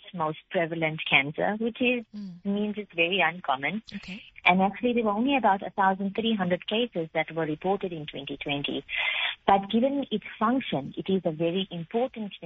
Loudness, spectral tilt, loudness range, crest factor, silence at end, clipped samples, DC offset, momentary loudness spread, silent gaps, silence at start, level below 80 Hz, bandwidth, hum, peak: -27 LUFS; -3 dB/octave; 3 LU; 22 dB; 0 s; under 0.1%; under 0.1%; 9 LU; none; 0.05 s; -62 dBFS; 6.2 kHz; none; -6 dBFS